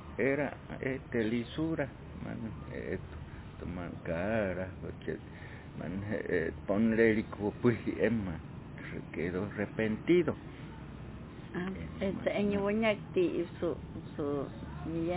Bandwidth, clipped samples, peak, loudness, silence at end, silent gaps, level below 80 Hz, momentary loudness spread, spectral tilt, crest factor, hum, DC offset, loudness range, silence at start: 4 kHz; under 0.1%; -12 dBFS; -34 LUFS; 0 s; none; -52 dBFS; 16 LU; -6 dB/octave; 22 dB; none; under 0.1%; 6 LU; 0 s